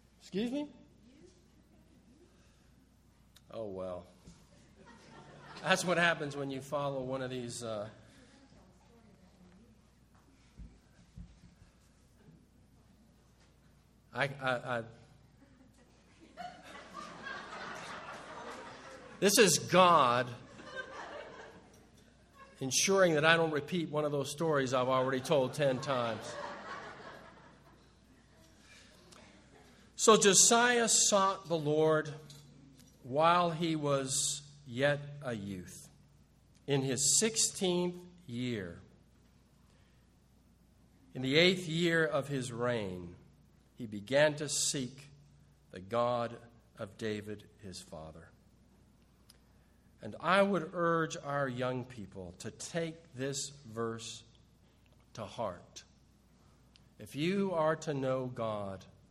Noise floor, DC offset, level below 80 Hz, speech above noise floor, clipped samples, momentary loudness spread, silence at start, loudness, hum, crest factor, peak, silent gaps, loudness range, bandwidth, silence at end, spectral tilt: -65 dBFS; under 0.1%; -68 dBFS; 33 dB; under 0.1%; 23 LU; 0.25 s; -31 LUFS; none; 26 dB; -8 dBFS; none; 18 LU; 15.5 kHz; 0.25 s; -3 dB/octave